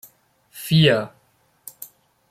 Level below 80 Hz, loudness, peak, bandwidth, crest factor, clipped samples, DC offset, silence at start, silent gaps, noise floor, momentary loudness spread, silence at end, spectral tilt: -58 dBFS; -18 LUFS; -2 dBFS; 16 kHz; 20 dB; under 0.1%; under 0.1%; 0.55 s; none; -62 dBFS; 25 LU; 0.45 s; -5.5 dB/octave